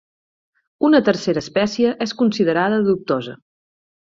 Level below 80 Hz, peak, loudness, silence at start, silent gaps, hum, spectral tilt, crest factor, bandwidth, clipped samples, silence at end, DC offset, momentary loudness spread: -58 dBFS; -2 dBFS; -18 LUFS; 0.8 s; none; none; -6 dB/octave; 16 dB; 7.6 kHz; under 0.1%; 0.8 s; under 0.1%; 7 LU